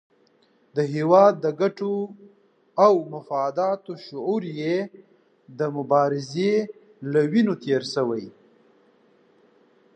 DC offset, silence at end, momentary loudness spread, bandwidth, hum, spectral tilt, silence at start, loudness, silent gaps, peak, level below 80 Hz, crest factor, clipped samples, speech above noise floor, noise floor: under 0.1%; 1.65 s; 14 LU; 9.2 kHz; none; -7 dB/octave; 0.75 s; -23 LUFS; none; -4 dBFS; -78 dBFS; 20 dB; under 0.1%; 39 dB; -62 dBFS